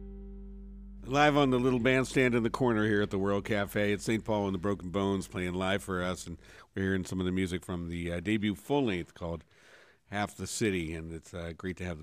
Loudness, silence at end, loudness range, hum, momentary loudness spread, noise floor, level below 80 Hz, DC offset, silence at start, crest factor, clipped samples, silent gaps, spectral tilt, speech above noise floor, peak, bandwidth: -31 LUFS; 0 s; 6 LU; none; 16 LU; -59 dBFS; -52 dBFS; under 0.1%; 0 s; 20 dB; under 0.1%; none; -5.5 dB/octave; 29 dB; -12 dBFS; 15.5 kHz